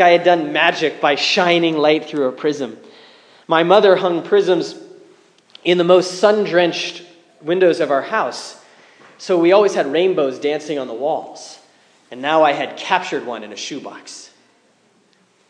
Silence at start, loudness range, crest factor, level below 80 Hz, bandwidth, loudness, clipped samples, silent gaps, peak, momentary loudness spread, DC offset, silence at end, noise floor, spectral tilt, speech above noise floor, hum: 0 s; 5 LU; 18 dB; -76 dBFS; 10 kHz; -16 LUFS; under 0.1%; none; 0 dBFS; 18 LU; under 0.1%; 1.25 s; -57 dBFS; -4.5 dB/octave; 41 dB; none